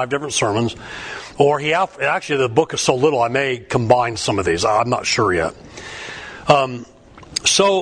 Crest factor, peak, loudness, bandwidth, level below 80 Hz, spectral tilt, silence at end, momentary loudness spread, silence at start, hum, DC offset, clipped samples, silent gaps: 18 dB; 0 dBFS; -18 LUFS; 10.5 kHz; -48 dBFS; -3.5 dB/octave; 0 s; 14 LU; 0 s; none; under 0.1%; under 0.1%; none